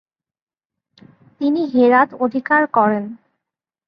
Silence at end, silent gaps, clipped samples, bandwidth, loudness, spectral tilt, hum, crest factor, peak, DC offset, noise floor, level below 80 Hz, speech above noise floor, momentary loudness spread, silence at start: 0.7 s; none; under 0.1%; 5.6 kHz; -16 LUFS; -8.5 dB/octave; none; 18 dB; -2 dBFS; under 0.1%; -84 dBFS; -68 dBFS; 68 dB; 10 LU; 1.4 s